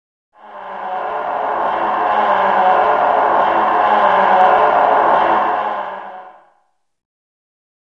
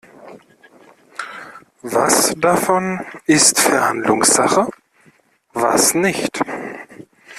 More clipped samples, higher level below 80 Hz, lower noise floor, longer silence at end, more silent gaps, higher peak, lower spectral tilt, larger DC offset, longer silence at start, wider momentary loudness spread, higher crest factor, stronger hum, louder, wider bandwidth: neither; about the same, -56 dBFS vs -58 dBFS; first, -63 dBFS vs -55 dBFS; first, 1.55 s vs 0 s; neither; about the same, 0 dBFS vs 0 dBFS; first, -5.5 dB/octave vs -2.5 dB/octave; neither; first, 0.45 s vs 0.2 s; second, 14 LU vs 20 LU; about the same, 16 dB vs 18 dB; neither; about the same, -14 LUFS vs -15 LUFS; second, 6.6 kHz vs 15.5 kHz